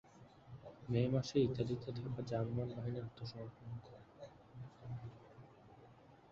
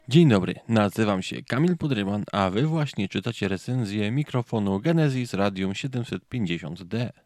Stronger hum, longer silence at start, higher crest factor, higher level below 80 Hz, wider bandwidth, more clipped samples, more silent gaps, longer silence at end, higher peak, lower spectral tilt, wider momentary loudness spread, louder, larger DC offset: neither; about the same, 0.05 s vs 0.1 s; about the same, 20 dB vs 18 dB; about the same, -66 dBFS vs -62 dBFS; second, 7.4 kHz vs 13 kHz; neither; neither; about the same, 0.05 s vs 0.15 s; second, -22 dBFS vs -6 dBFS; about the same, -7.5 dB/octave vs -7 dB/octave; first, 25 LU vs 8 LU; second, -41 LUFS vs -25 LUFS; neither